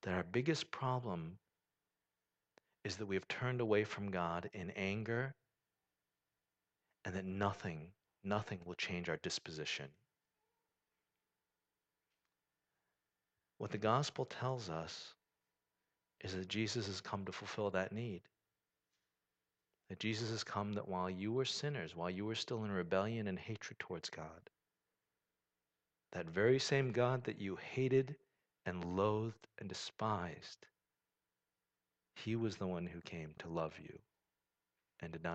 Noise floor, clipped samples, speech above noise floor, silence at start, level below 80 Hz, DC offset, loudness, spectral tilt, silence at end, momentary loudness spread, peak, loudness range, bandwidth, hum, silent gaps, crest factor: under -90 dBFS; under 0.1%; over 49 dB; 0.05 s; -74 dBFS; under 0.1%; -41 LUFS; -5.5 dB/octave; 0 s; 15 LU; -20 dBFS; 7 LU; 8.8 kHz; none; none; 22 dB